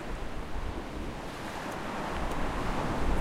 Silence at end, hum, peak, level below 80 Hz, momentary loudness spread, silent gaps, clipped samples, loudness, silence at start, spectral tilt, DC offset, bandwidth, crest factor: 0 s; none; -16 dBFS; -38 dBFS; 7 LU; none; under 0.1%; -36 LUFS; 0 s; -5.5 dB/octave; under 0.1%; 15.5 kHz; 16 dB